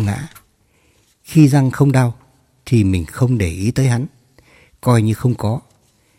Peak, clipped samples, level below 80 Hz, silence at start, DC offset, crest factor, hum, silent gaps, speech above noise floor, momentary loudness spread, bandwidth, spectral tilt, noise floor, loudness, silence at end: 0 dBFS; under 0.1%; -42 dBFS; 0 s; under 0.1%; 16 dB; none; none; 43 dB; 10 LU; 15 kHz; -7.5 dB/octave; -57 dBFS; -16 LUFS; 0.6 s